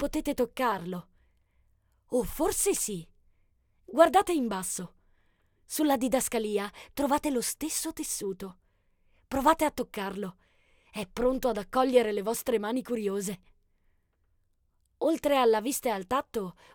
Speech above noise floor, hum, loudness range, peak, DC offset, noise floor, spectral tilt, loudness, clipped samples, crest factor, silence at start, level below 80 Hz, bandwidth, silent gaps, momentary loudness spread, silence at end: 43 dB; none; 4 LU; -8 dBFS; under 0.1%; -71 dBFS; -3.5 dB/octave; -29 LUFS; under 0.1%; 22 dB; 0 s; -52 dBFS; 19 kHz; none; 13 LU; 0.25 s